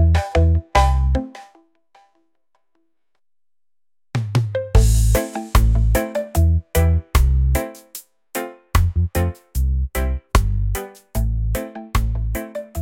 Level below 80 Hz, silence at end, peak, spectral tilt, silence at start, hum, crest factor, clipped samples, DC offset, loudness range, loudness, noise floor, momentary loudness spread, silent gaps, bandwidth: -22 dBFS; 0 s; 0 dBFS; -6 dB/octave; 0 s; none; 18 dB; under 0.1%; under 0.1%; 7 LU; -20 LUFS; under -90 dBFS; 12 LU; none; 17 kHz